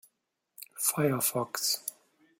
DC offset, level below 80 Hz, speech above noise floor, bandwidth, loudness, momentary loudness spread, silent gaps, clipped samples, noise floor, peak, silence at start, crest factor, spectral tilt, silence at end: under 0.1%; -76 dBFS; 50 dB; 16.5 kHz; -29 LUFS; 16 LU; none; under 0.1%; -79 dBFS; -12 dBFS; 0.6 s; 22 dB; -3 dB/octave; 0.5 s